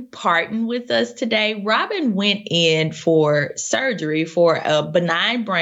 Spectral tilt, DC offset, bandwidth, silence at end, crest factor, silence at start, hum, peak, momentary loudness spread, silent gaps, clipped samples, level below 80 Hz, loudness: -4 dB/octave; under 0.1%; 8.2 kHz; 0 s; 14 dB; 0 s; none; -4 dBFS; 5 LU; none; under 0.1%; -68 dBFS; -19 LUFS